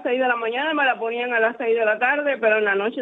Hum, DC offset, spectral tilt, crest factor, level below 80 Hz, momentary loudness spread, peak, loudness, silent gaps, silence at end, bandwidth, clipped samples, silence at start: none; under 0.1%; -6 dB/octave; 16 dB; -80 dBFS; 3 LU; -6 dBFS; -20 LUFS; none; 0 s; 4.1 kHz; under 0.1%; 0 s